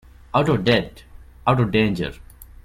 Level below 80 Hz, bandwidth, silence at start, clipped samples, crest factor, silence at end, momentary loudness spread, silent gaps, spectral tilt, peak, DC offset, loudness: -42 dBFS; 15 kHz; 0.35 s; under 0.1%; 18 dB; 0.1 s; 10 LU; none; -7 dB/octave; -4 dBFS; under 0.1%; -21 LUFS